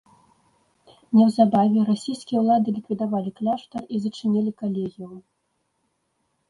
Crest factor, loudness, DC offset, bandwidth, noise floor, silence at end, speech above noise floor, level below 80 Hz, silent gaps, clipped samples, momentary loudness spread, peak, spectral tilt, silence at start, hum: 18 dB; -22 LUFS; under 0.1%; 11 kHz; -73 dBFS; 1.3 s; 51 dB; -68 dBFS; none; under 0.1%; 12 LU; -4 dBFS; -8 dB/octave; 1.1 s; none